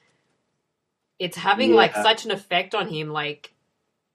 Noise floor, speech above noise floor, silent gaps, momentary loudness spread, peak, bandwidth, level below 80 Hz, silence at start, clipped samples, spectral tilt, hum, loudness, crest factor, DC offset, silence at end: -78 dBFS; 56 dB; none; 14 LU; -2 dBFS; 14.5 kHz; -72 dBFS; 1.2 s; under 0.1%; -4 dB/octave; none; -21 LUFS; 22 dB; under 0.1%; 0.8 s